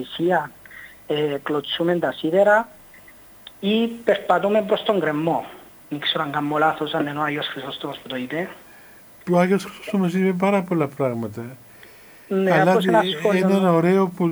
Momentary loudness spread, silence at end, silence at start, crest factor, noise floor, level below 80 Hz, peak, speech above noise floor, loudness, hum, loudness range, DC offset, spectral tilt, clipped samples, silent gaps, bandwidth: 14 LU; 0 s; 0 s; 20 dB; -46 dBFS; -64 dBFS; -2 dBFS; 26 dB; -21 LUFS; none; 4 LU; under 0.1%; -6.5 dB/octave; under 0.1%; none; over 20 kHz